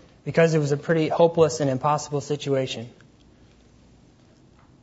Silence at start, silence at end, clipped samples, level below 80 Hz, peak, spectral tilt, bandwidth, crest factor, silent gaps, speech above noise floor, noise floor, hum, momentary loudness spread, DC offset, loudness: 0.25 s; 1.95 s; under 0.1%; -60 dBFS; -6 dBFS; -6 dB/octave; 8 kHz; 20 dB; none; 32 dB; -54 dBFS; none; 10 LU; under 0.1%; -23 LUFS